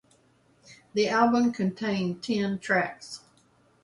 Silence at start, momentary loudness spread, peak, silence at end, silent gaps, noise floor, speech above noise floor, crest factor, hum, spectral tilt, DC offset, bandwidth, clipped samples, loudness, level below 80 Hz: 0.7 s; 15 LU; -8 dBFS; 0.65 s; none; -63 dBFS; 37 dB; 20 dB; none; -5.5 dB/octave; under 0.1%; 11.5 kHz; under 0.1%; -26 LUFS; -68 dBFS